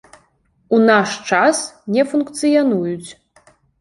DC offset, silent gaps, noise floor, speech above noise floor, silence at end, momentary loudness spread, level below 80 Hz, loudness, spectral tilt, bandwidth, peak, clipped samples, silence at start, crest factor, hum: under 0.1%; none; -60 dBFS; 44 dB; 0.7 s; 11 LU; -62 dBFS; -16 LUFS; -4.5 dB/octave; 11.5 kHz; -2 dBFS; under 0.1%; 0.7 s; 16 dB; none